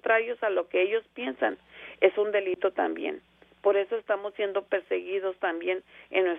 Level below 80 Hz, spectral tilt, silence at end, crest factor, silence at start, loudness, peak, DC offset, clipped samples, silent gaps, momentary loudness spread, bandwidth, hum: -74 dBFS; -6.5 dB/octave; 0 s; 20 dB; 0.05 s; -28 LUFS; -8 dBFS; under 0.1%; under 0.1%; none; 9 LU; 3.8 kHz; none